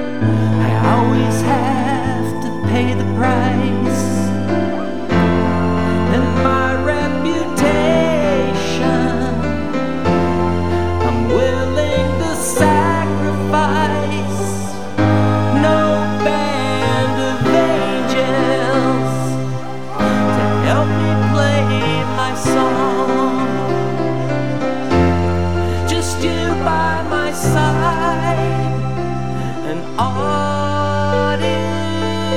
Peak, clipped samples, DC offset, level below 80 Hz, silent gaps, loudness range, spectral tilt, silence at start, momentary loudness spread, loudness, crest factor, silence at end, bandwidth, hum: 0 dBFS; under 0.1%; 5%; -36 dBFS; none; 2 LU; -6 dB/octave; 0 s; 6 LU; -16 LUFS; 16 dB; 0 s; 15.5 kHz; none